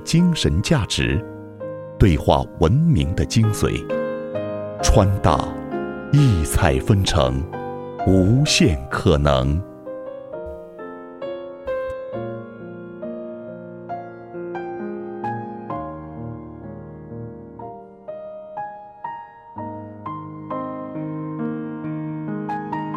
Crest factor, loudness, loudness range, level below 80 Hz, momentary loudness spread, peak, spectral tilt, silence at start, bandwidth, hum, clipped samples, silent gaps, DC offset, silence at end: 22 dB; -21 LUFS; 15 LU; -32 dBFS; 19 LU; 0 dBFS; -6 dB/octave; 0 s; 16 kHz; none; under 0.1%; none; under 0.1%; 0 s